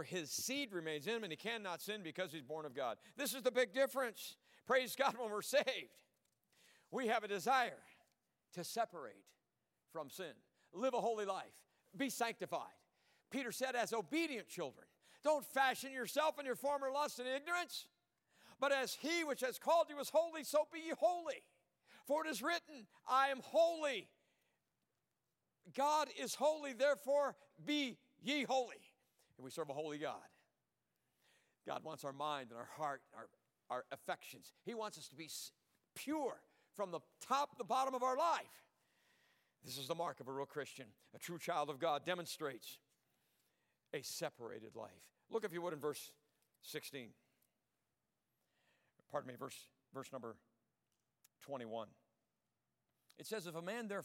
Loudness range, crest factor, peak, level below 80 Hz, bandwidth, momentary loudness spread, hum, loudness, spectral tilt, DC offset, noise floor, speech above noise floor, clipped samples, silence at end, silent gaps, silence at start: 12 LU; 22 dB; -22 dBFS; under -90 dBFS; 16.5 kHz; 17 LU; none; -41 LUFS; -3 dB/octave; under 0.1%; -90 dBFS; 48 dB; under 0.1%; 0 s; none; 0 s